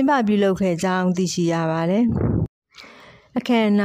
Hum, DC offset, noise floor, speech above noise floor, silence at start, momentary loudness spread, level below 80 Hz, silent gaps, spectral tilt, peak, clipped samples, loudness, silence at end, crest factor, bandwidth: none; under 0.1%; -47 dBFS; 28 dB; 0 s; 8 LU; -42 dBFS; 2.49-2.62 s; -6 dB/octave; -8 dBFS; under 0.1%; -21 LUFS; 0 s; 12 dB; 13 kHz